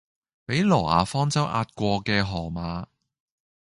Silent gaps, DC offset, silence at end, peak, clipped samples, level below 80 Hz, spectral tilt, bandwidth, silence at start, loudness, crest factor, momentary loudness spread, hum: none; under 0.1%; 0.9 s; -4 dBFS; under 0.1%; -46 dBFS; -5.5 dB/octave; 11.5 kHz; 0.5 s; -24 LUFS; 22 dB; 13 LU; none